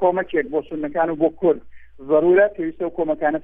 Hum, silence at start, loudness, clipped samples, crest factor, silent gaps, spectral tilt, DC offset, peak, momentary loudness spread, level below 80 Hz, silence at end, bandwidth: none; 0 s; -20 LUFS; under 0.1%; 14 dB; none; -10 dB/octave; under 0.1%; -4 dBFS; 10 LU; -52 dBFS; 0 s; 3.7 kHz